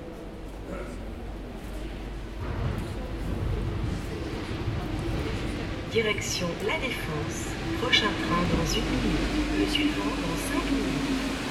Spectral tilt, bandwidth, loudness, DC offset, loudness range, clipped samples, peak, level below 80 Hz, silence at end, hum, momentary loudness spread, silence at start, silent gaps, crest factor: -4.5 dB/octave; 15.5 kHz; -29 LUFS; under 0.1%; 8 LU; under 0.1%; -8 dBFS; -36 dBFS; 0 s; none; 13 LU; 0 s; none; 22 dB